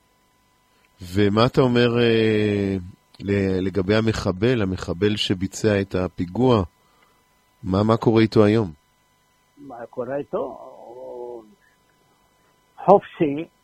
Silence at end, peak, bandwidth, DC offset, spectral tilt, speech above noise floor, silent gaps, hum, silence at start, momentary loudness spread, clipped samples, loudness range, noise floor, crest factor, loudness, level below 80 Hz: 0.15 s; 0 dBFS; 14 kHz; under 0.1%; -6.5 dB/octave; 42 dB; none; none; 1 s; 18 LU; under 0.1%; 13 LU; -62 dBFS; 22 dB; -21 LUFS; -50 dBFS